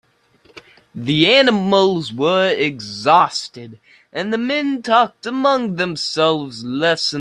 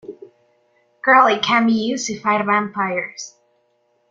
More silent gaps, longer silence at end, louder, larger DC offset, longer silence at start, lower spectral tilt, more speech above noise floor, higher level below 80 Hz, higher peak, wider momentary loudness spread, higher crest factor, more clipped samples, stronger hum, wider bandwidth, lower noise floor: neither; second, 0 s vs 0.8 s; about the same, -16 LUFS vs -17 LUFS; neither; first, 0.55 s vs 0.05 s; about the same, -4.5 dB/octave vs -3.5 dB/octave; second, 37 dB vs 46 dB; first, -60 dBFS vs -66 dBFS; about the same, 0 dBFS vs -2 dBFS; second, 13 LU vs 19 LU; about the same, 18 dB vs 18 dB; neither; neither; first, 11 kHz vs 7.6 kHz; second, -54 dBFS vs -64 dBFS